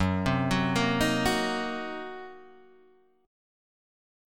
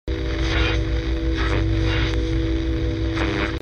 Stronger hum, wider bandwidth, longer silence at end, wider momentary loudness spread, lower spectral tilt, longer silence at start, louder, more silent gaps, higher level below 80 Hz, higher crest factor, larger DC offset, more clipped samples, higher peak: neither; first, 17.5 kHz vs 7 kHz; first, 1 s vs 0 s; first, 15 LU vs 3 LU; second, -5 dB/octave vs -6.5 dB/octave; about the same, 0 s vs 0.05 s; second, -27 LUFS vs -23 LUFS; neither; second, -48 dBFS vs -24 dBFS; first, 18 dB vs 12 dB; first, 0.3% vs under 0.1%; neither; second, -12 dBFS vs -8 dBFS